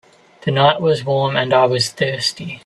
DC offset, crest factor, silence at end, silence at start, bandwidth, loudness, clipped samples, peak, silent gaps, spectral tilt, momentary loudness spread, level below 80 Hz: under 0.1%; 16 dB; 0.05 s; 0.45 s; 12.5 kHz; -17 LUFS; under 0.1%; 0 dBFS; none; -4.5 dB/octave; 7 LU; -56 dBFS